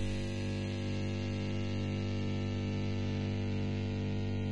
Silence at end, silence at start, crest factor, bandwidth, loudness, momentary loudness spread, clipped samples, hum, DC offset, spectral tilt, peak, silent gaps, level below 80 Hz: 0 s; 0 s; 10 dB; 8.8 kHz; -36 LUFS; 1 LU; under 0.1%; 50 Hz at -55 dBFS; 0.4%; -7 dB/octave; -26 dBFS; none; -50 dBFS